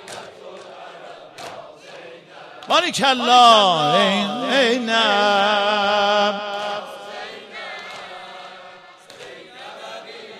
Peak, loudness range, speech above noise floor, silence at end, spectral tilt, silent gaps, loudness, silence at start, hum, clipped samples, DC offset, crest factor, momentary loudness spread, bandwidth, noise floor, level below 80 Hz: -2 dBFS; 17 LU; 27 dB; 0 s; -3 dB/octave; none; -16 LUFS; 0 s; none; under 0.1%; under 0.1%; 20 dB; 24 LU; 14.5 kHz; -43 dBFS; -68 dBFS